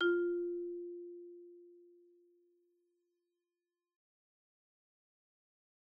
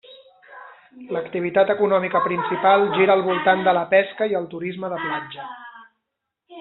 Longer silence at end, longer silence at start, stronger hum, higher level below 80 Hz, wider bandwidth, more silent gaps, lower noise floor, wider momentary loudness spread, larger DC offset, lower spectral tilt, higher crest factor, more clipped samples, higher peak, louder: first, 4.15 s vs 0 s; about the same, 0 s vs 0.1 s; neither; second, -84 dBFS vs -68 dBFS; second, 3.3 kHz vs 4.2 kHz; neither; first, under -90 dBFS vs -80 dBFS; first, 24 LU vs 13 LU; neither; second, 2.5 dB/octave vs -3 dB/octave; about the same, 20 dB vs 18 dB; neither; second, -22 dBFS vs -4 dBFS; second, -39 LUFS vs -20 LUFS